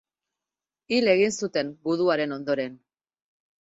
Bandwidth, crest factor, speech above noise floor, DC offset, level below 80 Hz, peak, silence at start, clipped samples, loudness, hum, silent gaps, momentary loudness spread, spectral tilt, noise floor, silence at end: 8 kHz; 20 dB; over 66 dB; under 0.1%; -70 dBFS; -8 dBFS; 0.9 s; under 0.1%; -25 LUFS; none; none; 7 LU; -4.5 dB/octave; under -90 dBFS; 0.85 s